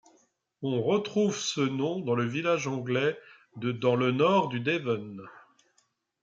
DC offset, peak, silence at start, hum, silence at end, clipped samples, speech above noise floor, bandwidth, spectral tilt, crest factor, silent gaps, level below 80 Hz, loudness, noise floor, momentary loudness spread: under 0.1%; -12 dBFS; 0.6 s; none; 0.85 s; under 0.1%; 44 dB; 9.2 kHz; -5.5 dB/octave; 18 dB; none; -76 dBFS; -28 LUFS; -72 dBFS; 10 LU